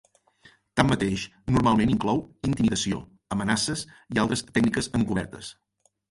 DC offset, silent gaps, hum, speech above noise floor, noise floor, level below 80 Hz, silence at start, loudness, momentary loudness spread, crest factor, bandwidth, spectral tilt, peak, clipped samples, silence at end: under 0.1%; none; none; 33 dB; -58 dBFS; -46 dBFS; 0.75 s; -25 LUFS; 11 LU; 22 dB; 11.5 kHz; -5 dB/octave; -4 dBFS; under 0.1%; 0.6 s